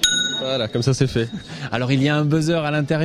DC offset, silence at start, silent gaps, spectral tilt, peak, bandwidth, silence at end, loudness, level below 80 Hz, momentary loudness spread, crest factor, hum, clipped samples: under 0.1%; 0 s; none; -4.5 dB/octave; -2 dBFS; 15 kHz; 0 s; -20 LUFS; -48 dBFS; 7 LU; 18 dB; none; under 0.1%